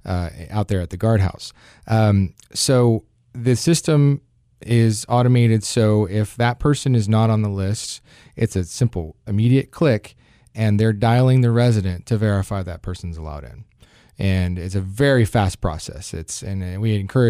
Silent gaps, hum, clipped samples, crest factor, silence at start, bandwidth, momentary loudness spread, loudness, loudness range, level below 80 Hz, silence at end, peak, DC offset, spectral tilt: none; none; under 0.1%; 14 dB; 0.05 s; 14 kHz; 14 LU; -19 LUFS; 4 LU; -40 dBFS; 0 s; -6 dBFS; under 0.1%; -6.5 dB/octave